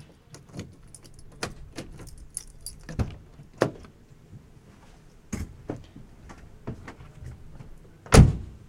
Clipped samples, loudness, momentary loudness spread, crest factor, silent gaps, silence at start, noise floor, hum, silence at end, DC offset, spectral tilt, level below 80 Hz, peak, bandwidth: under 0.1%; -26 LUFS; 29 LU; 28 dB; none; 0.55 s; -51 dBFS; none; 0.2 s; under 0.1%; -6 dB/octave; -34 dBFS; -2 dBFS; 16.5 kHz